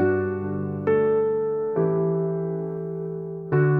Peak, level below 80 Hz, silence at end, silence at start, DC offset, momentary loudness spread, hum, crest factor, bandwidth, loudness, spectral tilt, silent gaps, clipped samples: -10 dBFS; -62 dBFS; 0 s; 0 s; under 0.1%; 9 LU; none; 14 dB; 3.3 kHz; -25 LUFS; -12 dB/octave; none; under 0.1%